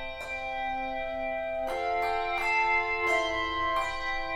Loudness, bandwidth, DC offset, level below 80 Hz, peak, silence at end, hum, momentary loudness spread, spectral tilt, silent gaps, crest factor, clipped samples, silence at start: -29 LUFS; 18 kHz; under 0.1%; -48 dBFS; -16 dBFS; 0 s; none; 7 LU; -3 dB/octave; none; 14 dB; under 0.1%; 0 s